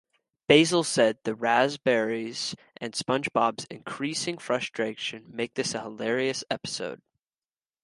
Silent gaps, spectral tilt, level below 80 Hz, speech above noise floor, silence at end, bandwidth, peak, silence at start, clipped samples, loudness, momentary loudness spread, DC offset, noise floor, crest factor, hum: none; -3.5 dB/octave; -70 dBFS; over 63 dB; 0.9 s; 11.5 kHz; -2 dBFS; 0.5 s; under 0.1%; -27 LUFS; 12 LU; under 0.1%; under -90 dBFS; 26 dB; none